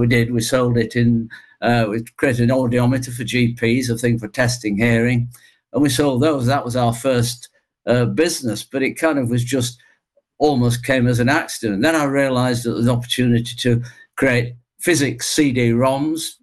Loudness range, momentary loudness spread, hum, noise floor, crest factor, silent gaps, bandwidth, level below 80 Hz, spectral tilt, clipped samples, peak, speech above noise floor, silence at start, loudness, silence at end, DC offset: 2 LU; 6 LU; none; -62 dBFS; 14 dB; none; 12.5 kHz; -46 dBFS; -5.5 dB/octave; under 0.1%; -6 dBFS; 44 dB; 0 s; -18 LUFS; 0.1 s; under 0.1%